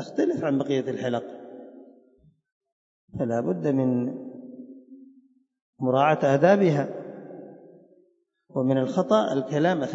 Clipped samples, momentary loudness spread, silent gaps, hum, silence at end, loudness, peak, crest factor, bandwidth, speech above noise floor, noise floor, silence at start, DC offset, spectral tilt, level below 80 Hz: under 0.1%; 22 LU; 2.52-2.61 s, 2.72-3.08 s, 5.62-5.73 s; none; 0 s; -24 LUFS; -6 dBFS; 20 dB; 7.8 kHz; 43 dB; -66 dBFS; 0 s; under 0.1%; -7.5 dB/octave; -70 dBFS